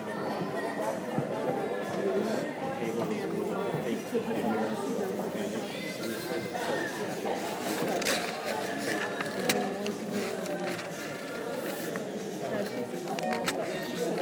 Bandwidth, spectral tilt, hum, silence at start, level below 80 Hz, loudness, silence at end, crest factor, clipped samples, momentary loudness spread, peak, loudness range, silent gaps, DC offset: 19.5 kHz; -4.5 dB/octave; none; 0 s; -72 dBFS; -32 LUFS; 0 s; 24 dB; under 0.1%; 5 LU; -10 dBFS; 3 LU; none; under 0.1%